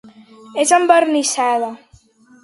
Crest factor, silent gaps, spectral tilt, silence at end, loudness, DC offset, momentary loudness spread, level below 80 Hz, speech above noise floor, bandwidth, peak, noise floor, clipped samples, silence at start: 18 dB; none; -1 dB/octave; 0.7 s; -15 LUFS; under 0.1%; 13 LU; -64 dBFS; 35 dB; 11.5 kHz; 0 dBFS; -49 dBFS; under 0.1%; 0.05 s